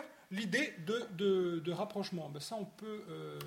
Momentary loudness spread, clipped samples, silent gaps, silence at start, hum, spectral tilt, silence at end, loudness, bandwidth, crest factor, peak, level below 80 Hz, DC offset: 12 LU; under 0.1%; none; 0 s; none; -5 dB/octave; 0 s; -38 LUFS; 16.5 kHz; 18 dB; -20 dBFS; -80 dBFS; under 0.1%